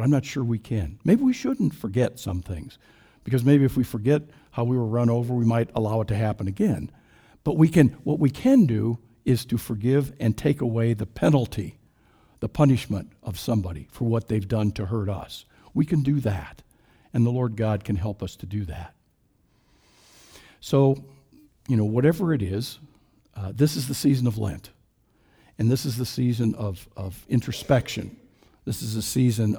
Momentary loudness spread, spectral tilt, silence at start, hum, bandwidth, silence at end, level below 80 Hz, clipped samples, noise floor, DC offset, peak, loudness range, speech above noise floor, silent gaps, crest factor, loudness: 15 LU; -7 dB/octave; 0 s; none; over 20 kHz; 0 s; -48 dBFS; under 0.1%; -65 dBFS; under 0.1%; -2 dBFS; 6 LU; 42 dB; none; 22 dB; -24 LUFS